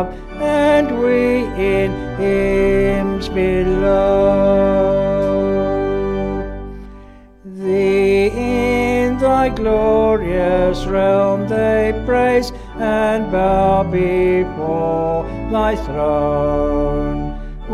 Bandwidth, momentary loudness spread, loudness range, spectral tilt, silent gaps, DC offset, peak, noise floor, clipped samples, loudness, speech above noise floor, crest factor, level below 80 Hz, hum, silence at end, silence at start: 12.5 kHz; 8 LU; 3 LU; -7 dB/octave; none; under 0.1%; -2 dBFS; -40 dBFS; under 0.1%; -16 LUFS; 24 dB; 14 dB; -30 dBFS; none; 0 s; 0 s